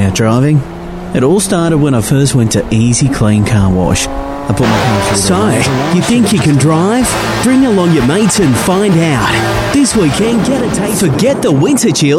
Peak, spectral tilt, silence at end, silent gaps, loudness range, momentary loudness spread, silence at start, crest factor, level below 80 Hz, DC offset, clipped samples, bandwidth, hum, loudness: 0 dBFS; -5 dB/octave; 0 s; none; 1 LU; 3 LU; 0 s; 10 dB; -30 dBFS; under 0.1%; under 0.1%; 16.5 kHz; none; -10 LUFS